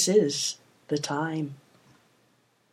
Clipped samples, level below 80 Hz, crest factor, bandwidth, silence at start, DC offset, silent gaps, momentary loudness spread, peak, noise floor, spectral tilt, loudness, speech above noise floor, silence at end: under 0.1%; -80 dBFS; 20 dB; 16 kHz; 0 s; under 0.1%; none; 17 LU; -10 dBFS; -67 dBFS; -3.5 dB/octave; -28 LUFS; 40 dB; 1.15 s